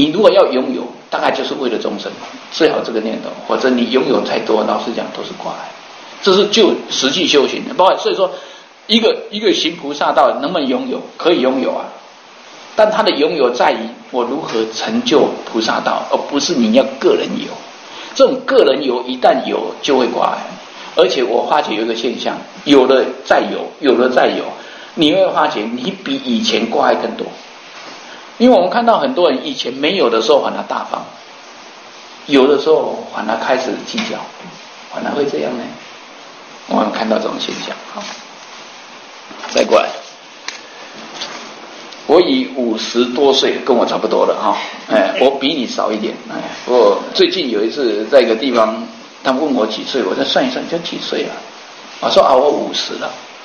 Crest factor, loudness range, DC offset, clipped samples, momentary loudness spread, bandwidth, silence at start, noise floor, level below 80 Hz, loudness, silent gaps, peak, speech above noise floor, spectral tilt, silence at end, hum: 16 dB; 6 LU; under 0.1%; 0.1%; 20 LU; 8.8 kHz; 0 s; -39 dBFS; -60 dBFS; -15 LUFS; none; 0 dBFS; 24 dB; -4 dB/octave; 0 s; none